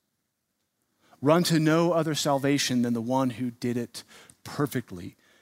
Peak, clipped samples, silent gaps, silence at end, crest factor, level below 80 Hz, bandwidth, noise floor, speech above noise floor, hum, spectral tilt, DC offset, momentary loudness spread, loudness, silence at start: -8 dBFS; under 0.1%; none; 0.3 s; 20 dB; -68 dBFS; 16 kHz; -79 dBFS; 53 dB; none; -5 dB/octave; under 0.1%; 19 LU; -26 LUFS; 1.2 s